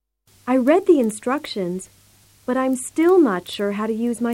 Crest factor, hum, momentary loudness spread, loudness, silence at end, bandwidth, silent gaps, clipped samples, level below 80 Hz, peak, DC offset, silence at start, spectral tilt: 16 dB; none; 12 LU; -20 LUFS; 0 s; 16.5 kHz; none; under 0.1%; -62 dBFS; -4 dBFS; under 0.1%; 0.45 s; -5 dB/octave